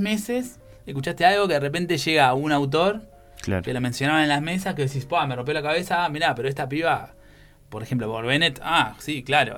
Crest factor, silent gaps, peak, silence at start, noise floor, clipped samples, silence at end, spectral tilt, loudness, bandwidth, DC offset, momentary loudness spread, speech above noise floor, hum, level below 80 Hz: 20 dB; none; -4 dBFS; 0 s; -50 dBFS; under 0.1%; 0 s; -5 dB/octave; -23 LUFS; 18 kHz; under 0.1%; 11 LU; 27 dB; none; -52 dBFS